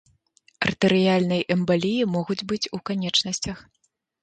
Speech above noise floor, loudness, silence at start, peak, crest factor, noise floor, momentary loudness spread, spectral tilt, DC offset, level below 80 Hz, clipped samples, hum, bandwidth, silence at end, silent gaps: 39 dB; -23 LUFS; 0.6 s; -6 dBFS; 18 dB; -62 dBFS; 8 LU; -5 dB/octave; under 0.1%; -56 dBFS; under 0.1%; none; 9.2 kHz; 0.6 s; none